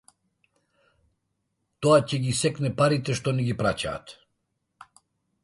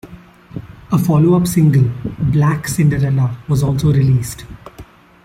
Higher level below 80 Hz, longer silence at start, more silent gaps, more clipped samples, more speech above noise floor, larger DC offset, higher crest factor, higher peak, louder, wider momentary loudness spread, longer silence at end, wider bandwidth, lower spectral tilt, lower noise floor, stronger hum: second, -56 dBFS vs -38 dBFS; first, 1.8 s vs 0.05 s; neither; neither; first, 53 dB vs 26 dB; neither; first, 20 dB vs 12 dB; second, -6 dBFS vs -2 dBFS; second, -24 LUFS vs -15 LUFS; second, 9 LU vs 20 LU; first, 1.3 s vs 0.4 s; second, 11.5 kHz vs 16 kHz; second, -5.5 dB/octave vs -7.5 dB/octave; first, -77 dBFS vs -40 dBFS; neither